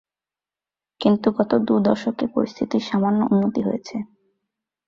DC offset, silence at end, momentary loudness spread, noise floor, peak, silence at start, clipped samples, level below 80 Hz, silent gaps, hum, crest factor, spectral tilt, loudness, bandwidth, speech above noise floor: under 0.1%; 0.8 s; 9 LU; under -90 dBFS; -4 dBFS; 1 s; under 0.1%; -60 dBFS; none; none; 18 dB; -7.5 dB/octave; -21 LUFS; 7.2 kHz; over 70 dB